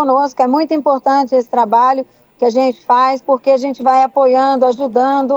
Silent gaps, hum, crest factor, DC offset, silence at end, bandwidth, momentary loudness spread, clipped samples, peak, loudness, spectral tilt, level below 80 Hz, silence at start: none; none; 12 dB; under 0.1%; 0 s; 7.8 kHz; 4 LU; under 0.1%; 0 dBFS; -13 LUFS; -5 dB/octave; -66 dBFS; 0 s